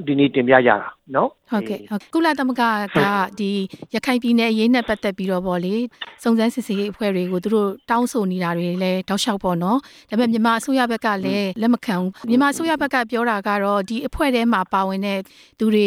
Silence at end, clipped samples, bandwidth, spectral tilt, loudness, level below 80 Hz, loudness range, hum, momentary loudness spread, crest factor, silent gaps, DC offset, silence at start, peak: 0 s; under 0.1%; 16 kHz; -5.5 dB/octave; -20 LUFS; -50 dBFS; 2 LU; none; 7 LU; 18 dB; none; under 0.1%; 0 s; 0 dBFS